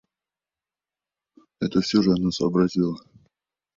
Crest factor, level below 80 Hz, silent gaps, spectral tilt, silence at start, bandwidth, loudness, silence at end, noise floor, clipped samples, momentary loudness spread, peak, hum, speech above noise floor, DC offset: 20 dB; -56 dBFS; none; -6.5 dB/octave; 1.6 s; 7.6 kHz; -23 LUFS; 0.8 s; under -90 dBFS; under 0.1%; 9 LU; -6 dBFS; none; over 68 dB; under 0.1%